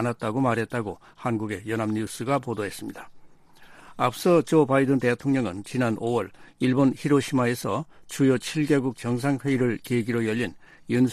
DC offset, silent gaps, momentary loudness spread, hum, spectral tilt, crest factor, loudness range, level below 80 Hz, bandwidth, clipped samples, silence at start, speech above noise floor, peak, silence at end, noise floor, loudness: under 0.1%; none; 10 LU; none; -6.5 dB/octave; 18 dB; 6 LU; -60 dBFS; 15 kHz; under 0.1%; 0 s; 25 dB; -8 dBFS; 0 s; -50 dBFS; -25 LUFS